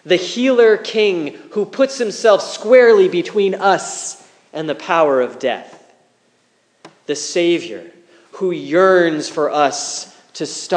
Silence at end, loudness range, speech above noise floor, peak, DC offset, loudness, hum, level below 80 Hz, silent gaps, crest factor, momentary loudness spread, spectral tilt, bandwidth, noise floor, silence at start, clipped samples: 0 s; 8 LU; 44 dB; 0 dBFS; under 0.1%; -16 LUFS; none; -80 dBFS; none; 16 dB; 16 LU; -3.5 dB/octave; 10 kHz; -60 dBFS; 0.05 s; under 0.1%